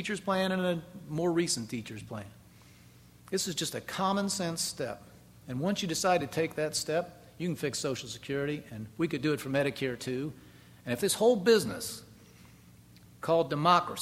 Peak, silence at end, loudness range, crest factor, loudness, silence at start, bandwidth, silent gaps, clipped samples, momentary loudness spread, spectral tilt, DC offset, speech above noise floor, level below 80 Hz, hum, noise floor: -10 dBFS; 0 s; 4 LU; 22 dB; -31 LUFS; 0 s; 16 kHz; none; under 0.1%; 15 LU; -4 dB/octave; under 0.1%; 26 dB; -64 dBFS; 60 Hz at -60 dBFS; -56 dBFS